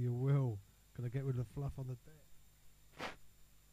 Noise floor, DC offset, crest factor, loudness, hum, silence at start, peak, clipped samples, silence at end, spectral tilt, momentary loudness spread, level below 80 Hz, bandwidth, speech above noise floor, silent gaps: -62 dBFS; under 0.1%; 18 dB; -41 LUFS; 50 Hz at -70 dBFS; 0 s; -24 dBFS; under 0.1%; 0.25 s; -8 dB/octave; 16 LU; -62 dBFS; 15 kHz; 20 dB; none